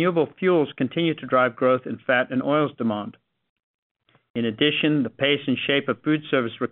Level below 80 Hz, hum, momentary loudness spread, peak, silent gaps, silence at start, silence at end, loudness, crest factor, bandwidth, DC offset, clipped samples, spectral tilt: -68 dBFS; none; 7 LU; -6 dBFS; 3.49-3.56 s, 3.63-3.95 s, 4.30-4.34 s; 0 s; 0.05 s; -23 LUFS; 18 dB; 4.2 kHz; under 0.1%; under 0.1%; -3.5 dB/octave